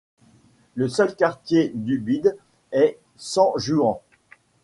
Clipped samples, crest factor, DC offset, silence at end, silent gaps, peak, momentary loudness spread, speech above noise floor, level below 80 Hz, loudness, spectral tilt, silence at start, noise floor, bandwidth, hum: under 0.1%; 18 dB; under 0.1%; 0.65 s; none; -4 dBFS; 7 LU; 36 dB; -60 dBFS; -22 LUFS; -5.5 dB/octave; 0.75 s; -56 dBFS; 11.5 kHz; none